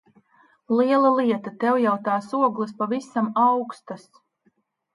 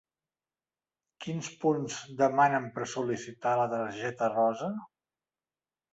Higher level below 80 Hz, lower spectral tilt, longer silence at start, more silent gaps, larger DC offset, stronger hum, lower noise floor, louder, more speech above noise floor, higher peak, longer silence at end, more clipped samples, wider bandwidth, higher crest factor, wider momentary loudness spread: about the same, -78 dBFS vs -74 dBFS; first, -7 dB/octave vs -5 dB/octave; second, 0.7 s vs 1.2 s; neither; neither; neither; second, -67 dBFS vs under -90 dBFS; first, -22 LUFS vs -30 LUFS; second, 45 dB vs over 60 dB; first, -6 dBFS vs -12 dBFS; about the same, 0.95 s vs 1.05 s; neither; first, 11.5 kHz vs 8.2 kHz; about the same, 16 dB vs 20 dB; about the same, 13 LU vs 12 LU